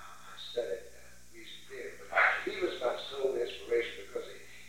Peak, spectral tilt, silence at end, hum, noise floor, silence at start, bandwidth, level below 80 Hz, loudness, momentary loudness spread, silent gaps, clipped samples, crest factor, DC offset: -14 dBFS; -3 dB/octave; 0 s; 60 Hz at -65 dBFS; -56 dBFS; 0 s; 16.5 kHz; -66 dBFS; -33 LUFS; 21 LU; none; under 0.1%; 22 dB; 0.3%